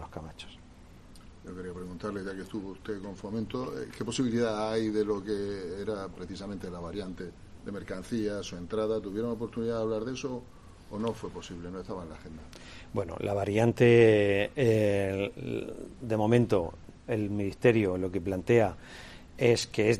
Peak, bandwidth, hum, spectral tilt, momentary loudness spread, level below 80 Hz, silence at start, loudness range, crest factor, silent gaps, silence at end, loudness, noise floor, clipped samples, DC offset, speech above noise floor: -8 dBFS; 13.5 kHz; none; -6.5 dB/octave; 18 LU; -54 dBFS; 0 s; 12 LU; 22 dB; none; 0 s; -30 LUFS; -52 dBFS; under 0.1%; under 0.1%; 22 dB